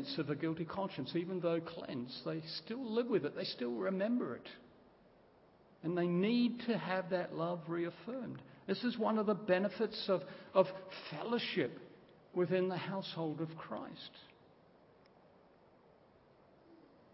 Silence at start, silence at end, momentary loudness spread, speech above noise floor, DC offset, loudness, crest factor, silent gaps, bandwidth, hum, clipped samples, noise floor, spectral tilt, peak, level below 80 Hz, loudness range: 0 s; 0.4 s; 12 LU; 28 dB; under 0.1%; -38 LUFS; 24 dB; none; 5.6 kHz; none; under 0.1%; -66 dBFS; -5 dB/octave; -16 dBFS; -80 dBFS; 5 LU